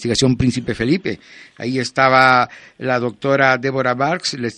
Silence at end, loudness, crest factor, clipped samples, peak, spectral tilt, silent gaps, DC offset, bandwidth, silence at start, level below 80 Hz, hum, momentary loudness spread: 0.05 s; -17 LUFS; 18 dB; under 0.1%; 0 dBFS; -5 dB/octave; none; under 0.1%; 11 kHz; 0 s; -44 dBFS; none; 12 LU